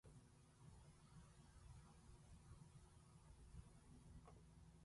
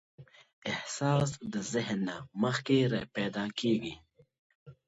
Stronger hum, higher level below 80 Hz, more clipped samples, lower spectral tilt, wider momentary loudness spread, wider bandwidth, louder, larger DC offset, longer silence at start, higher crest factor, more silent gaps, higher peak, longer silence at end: neither; second, -70 dBFS vs -64 dBFS; neither; about the same, -5.5 dB/octave vs -5.5 dB/octave; second, 3 LU vs 9 LU; first, 11.5 kHz vs 8 kHz; second, -67 LUFS vs -32 LUFS; neither; second, 0.05 s vs 0.2 s; about the same, 18 dB vs 18 dB; second, none vs 0.53-0.62 s, 4.39-4.66 s; second, -48 dBFS vs -14 dBFS; second, 0 s vs 0.15 s